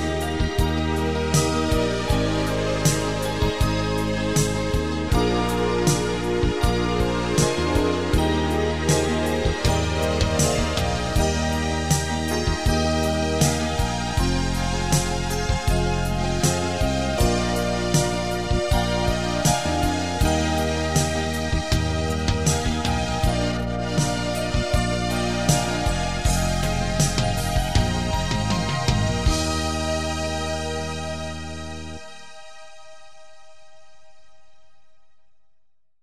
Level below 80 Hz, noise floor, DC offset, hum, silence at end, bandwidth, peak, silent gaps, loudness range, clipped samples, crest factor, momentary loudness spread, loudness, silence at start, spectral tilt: -30 dBFS; -62 dBFS; 1%; none; 0 s; 16 kHz; -4 dBFS; none; 3 LU; under 0.1%; 18 dB; 4 LU; -23 LUFS; 0 s; -4.5 dB/octave